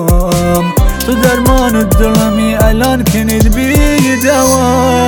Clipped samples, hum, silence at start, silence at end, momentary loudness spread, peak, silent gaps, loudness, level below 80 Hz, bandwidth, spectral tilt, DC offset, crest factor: under 0.1%; none; 0 s; 0 s; 2 LU; 0 dBFS; none; -10 LUFS; -16 dBFS; over 20 kHz; -5 dB/octave; under 0.1%; 8 dB